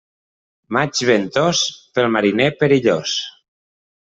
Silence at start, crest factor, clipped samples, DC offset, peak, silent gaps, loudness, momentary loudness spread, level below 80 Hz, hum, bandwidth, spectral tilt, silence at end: 0.7 s; 16 dB; under 0.1%; under 0.1%; -2 dBFS; none; -17 LUFS; 7 LU; -58 dBFS; none; 8.2 kHz; -4 dB/octave; 0.8 s